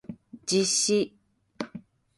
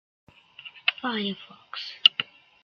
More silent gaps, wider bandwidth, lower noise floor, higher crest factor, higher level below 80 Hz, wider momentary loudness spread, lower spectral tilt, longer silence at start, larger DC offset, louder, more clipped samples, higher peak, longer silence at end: neither; second, 11.5 kHz vs 13.5 kHz; about the same, -47 dBFS vs -48 dBFS; second, 18 dB vs 28 dB; first, -68 dBFS vs -78 dBFS; about the same, 19 LU vs 21 LU; about the same, -3 dB/octave vs -3.5 dB/octave; second, 0.1 s vs 0.65 s; neither; about the same, -25 LUFS vs -24 LUFS; neither; second, -12 dBFS vs -2 dBFS; about the same, 0.35 s vs 0.4 s